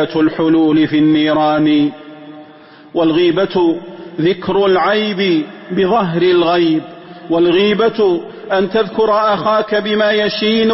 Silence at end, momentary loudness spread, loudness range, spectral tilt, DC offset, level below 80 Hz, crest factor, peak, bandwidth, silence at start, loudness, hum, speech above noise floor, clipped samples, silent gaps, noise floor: 0 s; 8 LU; 2 LU; -9.5 dB/octave; under 0.1%; -50 dBFS; 10 dB; -2 dBFS; 5.8 kHz; 0 s; -14 LUFS; none; 27 dB; under 0.1%; none; -40 dBFS